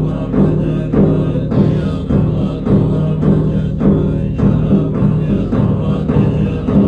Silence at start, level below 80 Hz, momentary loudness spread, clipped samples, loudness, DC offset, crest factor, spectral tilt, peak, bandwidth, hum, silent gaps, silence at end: 0 s; -26 dBFS; 3 LU; under 0.1%; -14 LUFS; under 0.1%; 12 dB; -10.5 dB/octave; -2 dBFS; 4.9 kHz; none; none; 0 s